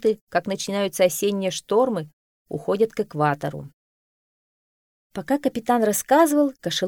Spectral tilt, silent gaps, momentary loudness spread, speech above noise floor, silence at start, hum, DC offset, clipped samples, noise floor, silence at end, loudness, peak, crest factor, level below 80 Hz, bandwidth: -4.5 dB/octave; 0.21-0.27 s, 2.13-2.46 s, 3.73-5.10 s; 13 LU; over 68 dB; 0 s; none; under 0.1%; under 0.1%; under -90 dBFS; 0 s; -22 LUFS; -6 dBFS; 16 dB; -62 dBFS; over 20 kHz